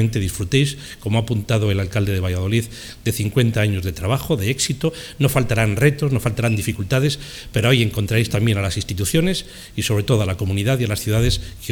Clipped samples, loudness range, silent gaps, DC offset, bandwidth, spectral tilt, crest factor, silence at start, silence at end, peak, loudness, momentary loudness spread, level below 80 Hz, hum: under 0.1%; 2 LU; none; under 0.1%; 18.5 kHz; -5.5 dB/octave; 18 dB; 0 s; 0 s; -2 dBFS; -20 LUFS; 6 LU; -36 dBFS; none